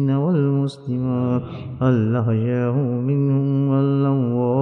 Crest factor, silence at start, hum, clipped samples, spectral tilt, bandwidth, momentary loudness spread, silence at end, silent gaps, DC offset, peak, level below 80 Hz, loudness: 12 dB; 0 s; none; under 0.1%; -10.5 dB/octave; 5.8 kHz; 5 LU; 0 s; none; under 0.1%; -6 dBFS; -56 dBFS; -20 LUFS